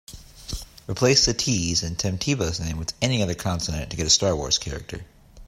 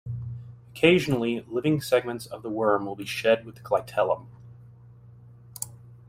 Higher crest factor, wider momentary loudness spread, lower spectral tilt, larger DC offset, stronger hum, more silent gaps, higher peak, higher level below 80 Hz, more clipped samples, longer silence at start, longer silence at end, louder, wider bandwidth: about the same, 20 dB vs 22 dB; about the same, 17 LU vs 16 LU; second, -3.5 dB/octave vs -5.5 dB/octave; neither; neither; neither; about the same, -4 dBFS vs -4 dBFS; first, -40 dBFS vs -60 dBFS; neither; about the same, 0.1 s vs 0.05 s; second, 0 s vs 0.15 s; first, -22 LUFS vs -26 LUFS; about the same, 16 kHz vs 16 kHz